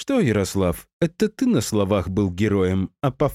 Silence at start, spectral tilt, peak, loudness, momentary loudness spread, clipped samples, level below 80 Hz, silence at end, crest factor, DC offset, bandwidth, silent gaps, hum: 0 s; -6.5 dB/octave; -6 dBFS; -22 LUFS; 5 LU; under 0.1%; -44 dBFS; 0 s; 14 dB; under 0.1%; 16 kHz; 0.93-1.00 s; none